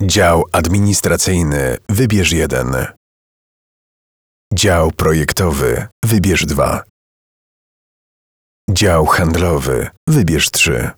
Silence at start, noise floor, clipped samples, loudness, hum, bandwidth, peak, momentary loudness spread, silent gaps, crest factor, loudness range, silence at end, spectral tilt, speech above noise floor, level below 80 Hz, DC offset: 0 s; under -90 dBFS; under 0.1%; -14 LUFS; none; over 20 kHz; 0 dBFS; 7 LU; 2.97-4.51 s, 5.92-6.02 s, 6.90-8.68 s, 9.97-10.07 s; 14 dB; 3 LU; 0.05 s; -4.5 dB/octave; over 77 dB; -30 dBFS; 0.3%